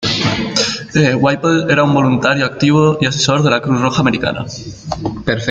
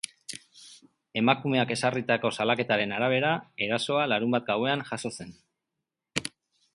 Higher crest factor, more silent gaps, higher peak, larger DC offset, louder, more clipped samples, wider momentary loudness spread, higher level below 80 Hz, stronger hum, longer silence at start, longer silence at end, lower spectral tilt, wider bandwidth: second, 14 dB vs 24 dB; neither; first, 0 dBFS vs -6 dBFS; neither; first, -14 LUFS vs -27 LUFS; neither; second, 10 LU vs 15 LU; first, -42 dBFS vs -68 dBFS; neither; second, 0 s vs 0.3 s; second, 0 s vs 0.45 s; about the same, -5 dB/octave vs -4.5 dB/octave; second, 9 kHz vs 11.5 kHz